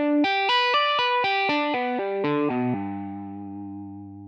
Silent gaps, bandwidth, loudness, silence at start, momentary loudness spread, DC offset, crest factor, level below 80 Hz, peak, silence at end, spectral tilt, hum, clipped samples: none; 7.2 kHz; -23 LUFS; 0 s; 16 LU; under 0.1%; 12 dB; -74 dBFS; -12 dBFS; 0 s; -5.5 dB/octave; none; under 0.1%